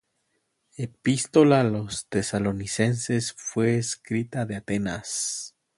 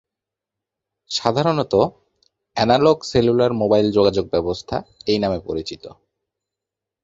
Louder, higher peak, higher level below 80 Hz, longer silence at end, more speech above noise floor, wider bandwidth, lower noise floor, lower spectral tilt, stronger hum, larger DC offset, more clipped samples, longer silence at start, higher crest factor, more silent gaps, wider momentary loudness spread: second, -25 LUFS vs -19 LUFS; second, -4 dBFS vs 0 dBFS; second, -56 dBFS vs -46 dBFS; second, 0.3 s vs 1.1 s; second, 49 dB vs 67 dB; first, 11.5 kHz vs 7.8 kHz; second, -74 dBFS vs -86 dBFS; about the same, -5 dB/octave vs -6 dB/octave; neither; neither; neither; second, 0.8 s vs 1.1 s; about the same, 20 dB vs 20 dB; neither; about the same, 11 LU vs 12 LU